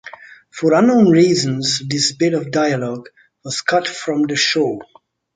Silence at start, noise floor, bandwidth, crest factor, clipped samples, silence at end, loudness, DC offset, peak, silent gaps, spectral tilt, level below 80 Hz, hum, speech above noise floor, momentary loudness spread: 0.05 s; -39 dBFS; 9.6 kHz; 16 dB; under 0.1%; 0.55 s; -16 LUFS; under 0.1%; -2 dBFS; none; -4.5 dB/octave; -60 dBFS; none; 23 dB; 17 LU